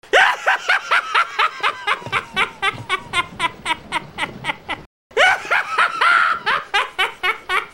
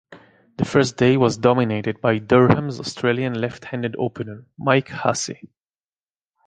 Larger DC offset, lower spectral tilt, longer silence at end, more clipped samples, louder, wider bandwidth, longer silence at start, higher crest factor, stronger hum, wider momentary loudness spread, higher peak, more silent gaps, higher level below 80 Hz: neither; second, -1.5 dB/octave vs -6 dB/octave; second, 0.05 s vs 1.1 s; neither; about the same, -18 LUFS vs -20 LUFS; first, 16 kHz vs 9.6 kHz; about the same, 0.05 s vs 0.1 s; about the same, 18 dB vs 20 dB; neither; about the same, 11 LU vs 11 LU; about the same, -2 dBFS vs -2 dBFS; first, 4.86-5.10 s vs none; about the same, -52 dBFS vs -52 dBFS